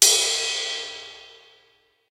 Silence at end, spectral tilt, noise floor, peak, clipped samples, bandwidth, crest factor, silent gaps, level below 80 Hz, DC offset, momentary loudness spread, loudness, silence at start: 0.85 s; 3 dB/octave; -62 dBFS; 0 dBFS; under 0.1%; 16 kHz; 24 dB; none; -70 dBFS; under 0.1%; 23 LU; -21 LUFS; 0 s